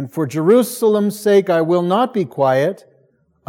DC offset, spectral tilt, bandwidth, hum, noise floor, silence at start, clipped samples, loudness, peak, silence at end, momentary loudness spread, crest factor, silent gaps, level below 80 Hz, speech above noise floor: under 0.1%; -6 dB/octave; 17 kHz; none; -58 dBFS; 0 s; under 0.1%; -16 LUFS; -2 dBFS; 0.75 s; 6 LU; 14 dB; none; -72 dBFS; 43 dB